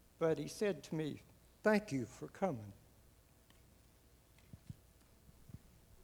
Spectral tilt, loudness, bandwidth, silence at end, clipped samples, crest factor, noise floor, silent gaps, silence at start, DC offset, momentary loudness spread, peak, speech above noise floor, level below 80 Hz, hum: -6 dB/octave; -39 LUFS; over 20 kHz; 0.45 s; under 0.1%; 24 dB; -67 dBFS; none; 0.2 s; under 0.1%; 24 LU; -18 dBFS; 28 dB; -68 dBFS; none